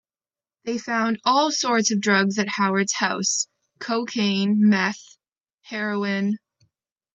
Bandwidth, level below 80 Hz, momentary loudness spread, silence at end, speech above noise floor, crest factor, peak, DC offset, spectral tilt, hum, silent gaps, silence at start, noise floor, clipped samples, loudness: 8 kHz; -74 dBFS; 11 LU; 0.75 s; over 68 dB; 18 dB; -4 dBFS; under 0.1%; -3.5 dB/octave; none; none; 0.65 s; under -90 dBFS; under 0.1%; -22 LUFS